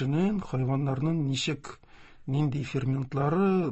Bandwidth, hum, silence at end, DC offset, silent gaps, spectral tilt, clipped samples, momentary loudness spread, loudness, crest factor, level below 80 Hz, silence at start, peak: 8.4 kHz; none; 0 s; 0.2%; none; -7 dB/octave; under 0.1%; 7 LU; -29 LUFS; 14 dB; -54 dBFS; 0 s; -14 dBFS